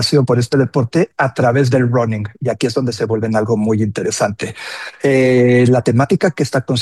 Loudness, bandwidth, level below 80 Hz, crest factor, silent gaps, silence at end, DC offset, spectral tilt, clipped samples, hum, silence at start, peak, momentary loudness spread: -15 LUFS; 12.5 kHz; -54 dBFS; 12 dB; none; 0 s; under 0.1%; -6 dB/octave; under 0.1%; none; 0 s; -2 dBFS; 8 LU